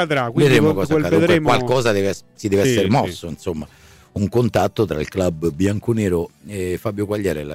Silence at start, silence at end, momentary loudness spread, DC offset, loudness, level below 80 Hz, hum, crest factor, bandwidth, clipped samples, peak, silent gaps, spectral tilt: 0 s; 0 s; 12 LU; under 0.1%; -19 LUFS; -44 dBFS; none; 12 dB; 16 kHz; under 0.1%; -6 dBFS; none; -6 dB/octave